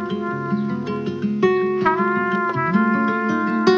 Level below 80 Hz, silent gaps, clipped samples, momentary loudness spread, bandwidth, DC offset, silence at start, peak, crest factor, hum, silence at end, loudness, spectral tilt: -64 dBFS; none; under 0.1%; 6 LU; 7.2 kHz; under 0.1%; 0 s; -2 dBFS; 18 dB; none; 0 s; -20 LUFS; -7.5 dB/octave